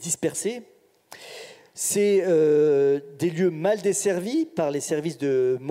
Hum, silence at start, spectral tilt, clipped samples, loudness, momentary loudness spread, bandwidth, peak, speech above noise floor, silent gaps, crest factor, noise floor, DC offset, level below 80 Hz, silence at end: none; 0 s; -4.5 dB/octave; under 0.1%; -23 LUFS; 20 LU; 16 kHz; -8 dBFS; 26 dB; none; 14 dB; -49 dBFS; under 0.1%; -74 dBFS; 0 s